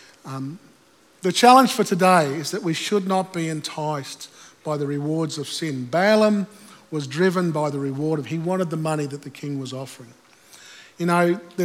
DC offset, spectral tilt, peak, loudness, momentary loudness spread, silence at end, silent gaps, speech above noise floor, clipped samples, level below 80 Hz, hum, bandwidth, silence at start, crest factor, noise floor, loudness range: under 0.1%; -5 dB/octave; 0 dBFS; -21 LUFS; 16 LU; 0 s; none; 30 dB; under 0.1%; -80 dBFS; none; 17 kHz; 0.25 s; 22 dB; -51 dBFS; 7 LU